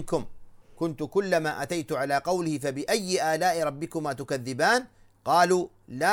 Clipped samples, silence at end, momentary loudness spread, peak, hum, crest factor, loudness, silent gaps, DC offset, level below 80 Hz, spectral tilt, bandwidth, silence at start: under 0.1%; 0 s; 9 LU; -8 dBFS; none; 20 dB; -27 LUFS; none; under 0.1%; -56 dBFS; -4 dB/octave; 17 kHz; 0 s